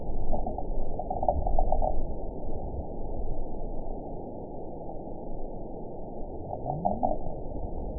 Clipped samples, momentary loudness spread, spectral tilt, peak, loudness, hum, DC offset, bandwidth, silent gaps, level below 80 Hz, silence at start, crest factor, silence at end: under 0.1%; 11 LU; -15 dB/octave; -10 dBFS; -35 LUFS; none; 0.5%; 1 kHz; none; -32 dBFS; 0 s; 18 dB; 0 s